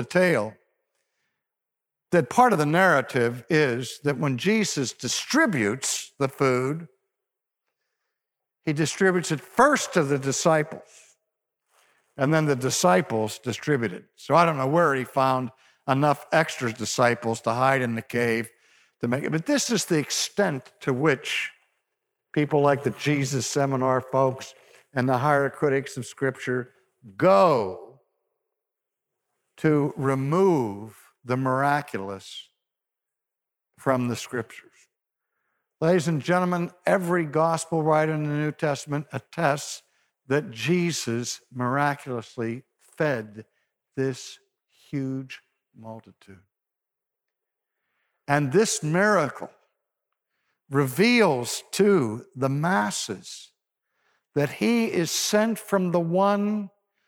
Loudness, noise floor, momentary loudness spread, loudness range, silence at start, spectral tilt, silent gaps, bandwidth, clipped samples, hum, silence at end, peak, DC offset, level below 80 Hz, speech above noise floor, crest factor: -24 LUFS; -87 dBFS; 14 LU; 7 LU; 0 s; -5 dB/octave; none; 18.5 kHz; under 0.1%; none; 0.4 s; -6 dBFS; under 0.1%; -70 dBFS; 63 dB; 20 dB